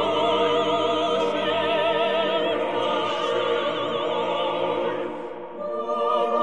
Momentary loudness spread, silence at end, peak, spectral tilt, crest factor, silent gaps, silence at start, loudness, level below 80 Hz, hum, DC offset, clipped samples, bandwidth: 8 LU; 0 s; -10 dBFS; -4.5 dB/octave; 14 dB; none; 0 s; -24 LUFS; -68 dBFS; none; 0.4%; under 0.1%; 10 kHz